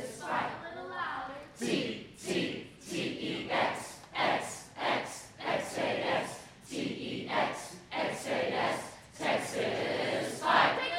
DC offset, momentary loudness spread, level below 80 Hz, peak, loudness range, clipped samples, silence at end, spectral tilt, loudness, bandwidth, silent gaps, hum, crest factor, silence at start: under 0.1%; 10 LU; -68 dBFS; -12 dBFS; 2 LU; under 0.1%; 0 s; -3.5 dB/octave; -33 LUFS; 16 kHz; none; none; 22 dB; 0 s